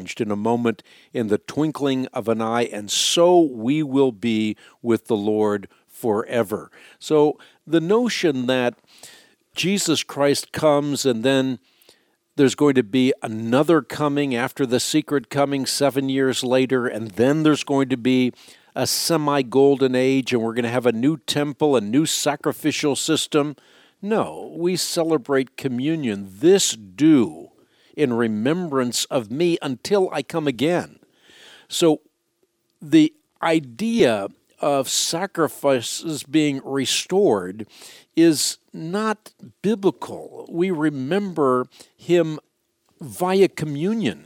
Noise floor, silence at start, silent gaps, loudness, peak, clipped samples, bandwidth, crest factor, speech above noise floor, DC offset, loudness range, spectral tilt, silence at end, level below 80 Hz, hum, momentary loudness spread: -69 dBFS; 0 s; none; -21 LUFS; -4 dBFS; under 0.1%; 17.5 kHz; 18 dB; 49 dB; under 0.1%; 3 LU; -4.5 dB/octave; 0.05 s; -68 dBFS; none; 9 LU